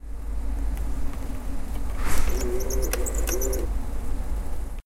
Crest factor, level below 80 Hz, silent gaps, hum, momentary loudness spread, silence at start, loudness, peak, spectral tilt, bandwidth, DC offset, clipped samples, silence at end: 18 dB; -26 dBFS; none; none; 8 LU; 0.05 s; -30 LUFS; -6 dBFS; -4.5 dB/octave; 16 kHz; under 0.1%; under 0.1%; 0.05 s